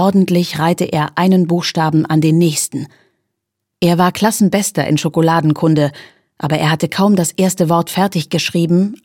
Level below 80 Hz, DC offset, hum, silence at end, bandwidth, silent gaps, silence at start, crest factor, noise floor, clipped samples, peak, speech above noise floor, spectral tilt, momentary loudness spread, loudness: -56 dBFS; under 0.1%; none; 0.1 s; 17 kHz; none; 0 s; 14 dB; -76 dBFS; under 0.1%; 0 dBFS; 62 dB; -5.5 dB/octave; 4 LU; -14 LUFS